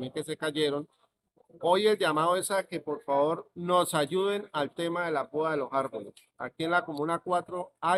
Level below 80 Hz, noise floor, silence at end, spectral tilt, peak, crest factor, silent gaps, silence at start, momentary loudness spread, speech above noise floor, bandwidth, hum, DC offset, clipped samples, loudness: -76 dBFS; -68 dBFS; 0 s; -4.5 dB/octave; -12 dBFS; 18 dB; none; 0 s; 11 LU; 39 dB; 15.5 kHz; none; under 0.1%; under 0.1%; -29 LUFS